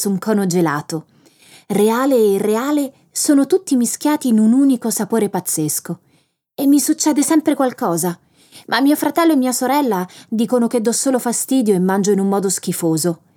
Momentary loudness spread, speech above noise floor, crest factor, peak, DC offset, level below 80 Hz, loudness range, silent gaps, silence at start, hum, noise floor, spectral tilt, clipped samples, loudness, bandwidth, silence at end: 8 LU; 44 dB; 16 dB; -2 dBFS; under 0.1%; -74 dBFS; 2 LU; none; 0 s; none; -60 dBFS; -4.5 dB/octave; under 0.1%; -16 LUFS; 19 kHz; 0.2 s